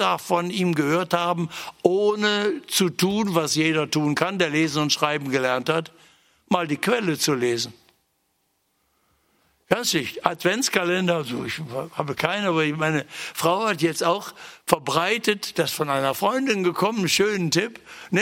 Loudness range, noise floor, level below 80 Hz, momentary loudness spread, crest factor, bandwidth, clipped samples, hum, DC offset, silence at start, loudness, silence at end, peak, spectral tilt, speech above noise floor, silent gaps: 5 LU; -70 dBFS; -64 dBFS; 7 LU; 24 dB; 16.5 kHz; under 0.1%; none; under 0.1%; 0 s; -23 LUFS; 0 s; 0 dBFS; -4 dB/octave; 48 dB; none